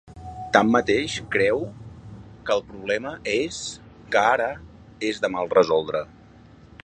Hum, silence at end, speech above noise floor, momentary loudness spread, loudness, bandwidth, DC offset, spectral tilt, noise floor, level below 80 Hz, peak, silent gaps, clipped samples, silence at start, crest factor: none; 0.15 s; 26 dB; 21 LU; -23 LUFS; 10 kHz; under 0.1%; -4.5 dB/octave; -49 dBFS; -52 dBFS; 0 dBFS; none; under 0.1%; 0.05 s; 24 dB